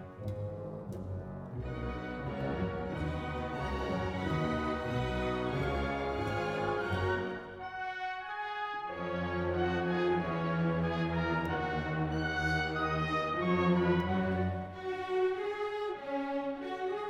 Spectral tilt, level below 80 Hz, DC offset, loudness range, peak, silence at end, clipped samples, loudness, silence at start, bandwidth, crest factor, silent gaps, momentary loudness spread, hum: -7.5 dB/octave; -50 dBFS; under 0.1%; 5 LU; -18 dBFS; 0 s; under 0.1%; -34 LUFS; 0 s; 11 kHz; 16 dB; none; 9 LU; none